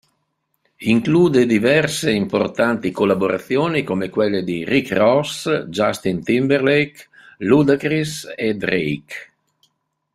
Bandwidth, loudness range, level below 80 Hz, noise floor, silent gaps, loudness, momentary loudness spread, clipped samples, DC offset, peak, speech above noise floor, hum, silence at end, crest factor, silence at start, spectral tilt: 15 kHz; 2 LU; -56 dBFS; -71 dBFS; none; -18 LUFS; 9 LU; under 0.1%; under 0.1%; -2 dBFS; 53 dB; none; 0.9 s; 16 dB; 0.8 s; -5.5 dB/octave